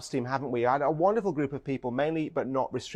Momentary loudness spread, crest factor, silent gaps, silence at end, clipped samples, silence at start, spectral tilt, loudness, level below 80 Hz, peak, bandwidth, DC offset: 7 LU; 16 dB; none; 0 s; under 0.1%; 0 s; -6.5 dB/octave; -29 LUFS; -62 dBFS; -12 dBFS; 12.5 kHz; under 0.1%